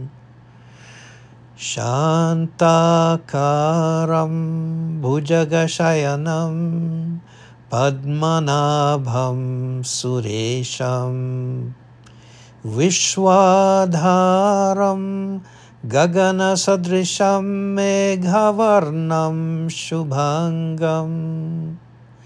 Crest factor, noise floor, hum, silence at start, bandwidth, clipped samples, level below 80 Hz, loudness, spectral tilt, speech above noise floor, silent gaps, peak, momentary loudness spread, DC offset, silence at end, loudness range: 16 dB; -45 dBFS; none; 0 s; 10.5 kHz; under 0.1%; -60 dBFS; -18 LUFS; -5.5 dB/octave; 27 dB; none; -2 dBFS; 11 LU; under 0.1%; 0.45 s; 5 LU